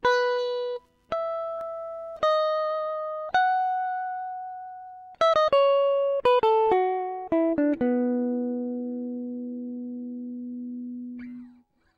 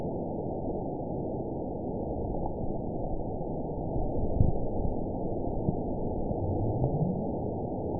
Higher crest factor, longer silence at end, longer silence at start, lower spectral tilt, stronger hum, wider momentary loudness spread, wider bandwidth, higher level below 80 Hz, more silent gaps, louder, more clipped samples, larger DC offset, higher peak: about the same, 16 dB vs 20 dB; first, 0.45 s vs 0 s; about the same, 0.05 s vs 0 s; second, -5 dB/octave vs -17 dB/octave; neither; first, 16 LU vs 6 LU; first, 8 kHz vs 1 kHz; second, -64 dBFS vs -38 dBFS; neither; first, -26 LUFS vs -33 LUFS; neither; second, under 0.1% vs 0.5%; about the same, -10 dBFS vs -10 dBFS